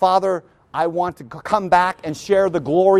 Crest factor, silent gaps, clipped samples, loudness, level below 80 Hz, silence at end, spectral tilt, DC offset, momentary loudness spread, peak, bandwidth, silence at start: 16 dB; none; under 0.1%; -19 LUFS; -54 dBFS; 0 s; -6 dB/octave; under 0.1%; 11 LU; -2 dBFS; 13 kHz; 0 s